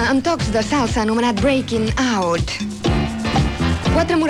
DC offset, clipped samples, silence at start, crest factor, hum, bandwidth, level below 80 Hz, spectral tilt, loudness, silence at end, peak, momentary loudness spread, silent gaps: under 0.1%; under 0.1%; 0 s; 12 dB; none; 13 kHz; -30 dBFS; -5.5 dB/octave; -19 LUFS; 0 s; -6 dBFS; 3 LU; none